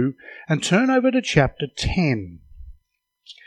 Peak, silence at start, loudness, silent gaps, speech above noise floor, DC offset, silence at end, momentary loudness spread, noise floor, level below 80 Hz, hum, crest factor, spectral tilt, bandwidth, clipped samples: -2 dBFS; 0 s; -21 LUFS; none; 47 dB; under 0.1%; 0.15 s; 10 LU; -67 dBFS; -40 dBFS; none; 20 dB; -5.5 dB/octave; 11 kHz; under 0.1%